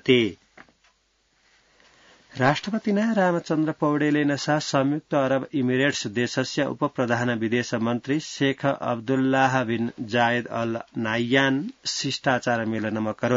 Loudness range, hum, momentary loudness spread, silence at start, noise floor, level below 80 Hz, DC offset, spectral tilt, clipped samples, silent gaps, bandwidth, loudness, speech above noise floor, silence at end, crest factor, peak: 2 LU; none; 6 LU; 0.05 s; -67 dBFS; -66 dBFS; under 0.1%; -5 dB/octave; under 0.1%; none; 7.8 kHz; -24 LUFS; 44 dB; 0 s; 18 dB; -6 dBFS